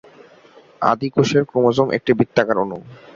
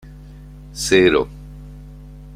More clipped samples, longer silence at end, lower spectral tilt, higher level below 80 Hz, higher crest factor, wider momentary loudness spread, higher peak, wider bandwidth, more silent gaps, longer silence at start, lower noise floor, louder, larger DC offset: neither; first, 0.2 s vs 0 s; first, -6.5 dB/octave vs -4 dB/octave; second, -56 dBFS vs -38 dBFS; about the same, 18 dB vs 20 dB; second, 5 LU vs 26 LU; about the same, -2 dBFS vs -2 dBFS; second, 7.6 kHz vs 15.5 kHz; neither; first, 0.8 s vs 0.05 s; first, -48 dBFS vs -38 dBFS; about the same, -18 LUFS vs -17 LUFS; neither